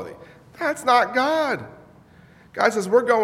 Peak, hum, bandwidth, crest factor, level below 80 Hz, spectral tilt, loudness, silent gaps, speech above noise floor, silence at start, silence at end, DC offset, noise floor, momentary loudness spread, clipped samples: -2 dBFS; none; 15.5 kHz; 20 dB; -64 dBFS; -4 dB/octave; -21 LUFS; none; 31 dB; 0 s; 0 s; under 0.1%; -50 dBFS; 18 LU; under 0.1%